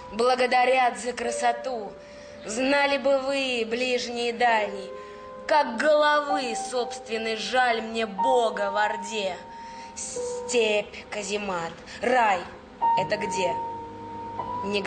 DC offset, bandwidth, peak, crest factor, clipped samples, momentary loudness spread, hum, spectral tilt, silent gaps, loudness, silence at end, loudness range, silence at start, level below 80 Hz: under 0.1%; 9.6 kHz; -12 dBFS; 14 dB; under 0.1%; 16 LU; none; -2.5 dB/octave; none; -25 LUFS; 0 s; 3 LU; 0 s; -60 dBFS